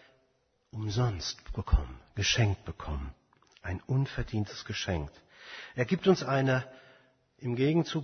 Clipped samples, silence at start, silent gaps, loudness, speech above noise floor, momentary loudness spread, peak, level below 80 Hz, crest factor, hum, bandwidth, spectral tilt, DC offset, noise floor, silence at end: under 0.1%; 0.75 s; none; -31 LUFS; 43 dB; 18 LU; -12 dBFS; -42 dBFS; 20 dB; none; 6.6 kHz; -5.5 dB/octave; under 0.1%; -73 dBFS; 0 s